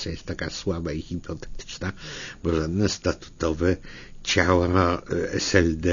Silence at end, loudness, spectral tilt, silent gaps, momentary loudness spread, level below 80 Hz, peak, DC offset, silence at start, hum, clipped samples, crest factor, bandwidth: 0 s; -25 LUFS; -5 dB/octave; none; 15 LU; -40 dBFS; -2 dBFS; under 0.1%; 0 s; none; under 0.1%; 22 dB; 7.4 kHz